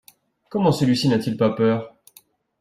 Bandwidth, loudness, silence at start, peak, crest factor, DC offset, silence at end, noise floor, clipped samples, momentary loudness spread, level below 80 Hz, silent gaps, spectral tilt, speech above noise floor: 15.5 kHz; -21 LUFS; 0.5 s; -6 dBFS; 16 dB; under 0.1%; 0.7 s; -55 dBFS; under 0.1%; 10 LU; -58 dBFS; none; -6.5 dB/octave; 36 dB